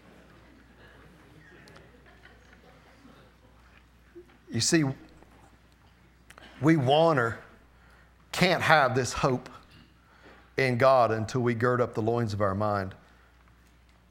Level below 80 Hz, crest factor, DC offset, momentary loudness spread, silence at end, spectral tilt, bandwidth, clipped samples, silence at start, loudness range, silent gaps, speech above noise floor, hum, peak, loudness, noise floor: -58 dBFS; 26 dB; under 0.1%; 15 LU; 1.15 s; -5 dB/octave; 17.5 kHz; under 0.1%; 4.15 s; 7 LU; none; 34 dB; none; -4 dBFS; -26 LUFS; -59 dBFS